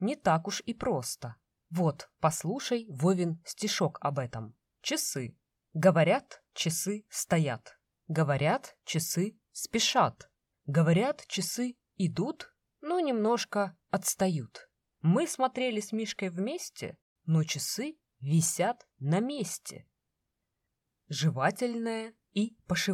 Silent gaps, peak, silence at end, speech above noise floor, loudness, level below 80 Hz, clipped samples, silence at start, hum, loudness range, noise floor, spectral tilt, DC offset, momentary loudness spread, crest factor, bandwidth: 17.02-17.16 s; -10 dBFS; 0 s; 54 dB; -31 LUFS; -68 dBFS; under 0.1%; 0 s; none; 3 LU; -84 dBFS; -4.5 dB/octave; under 0.1%; 13 LU; 22 dB; 16 kHz